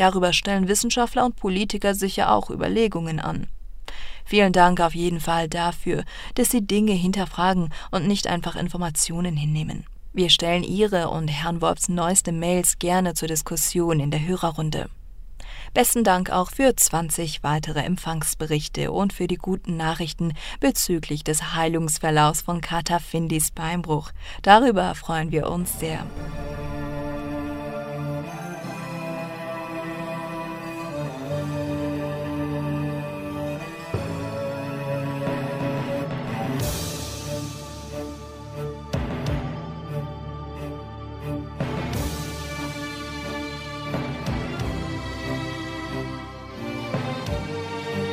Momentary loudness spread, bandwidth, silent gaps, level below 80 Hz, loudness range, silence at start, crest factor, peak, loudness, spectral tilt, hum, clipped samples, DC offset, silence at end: 13 LU; 16 kHz; none; -40 dBFS; 10 LU; 0 s; 24 dB; 0 dBFS; -24 LUFS; -4 dB/octave; none; under 0.1%; under 0.1%; 0 s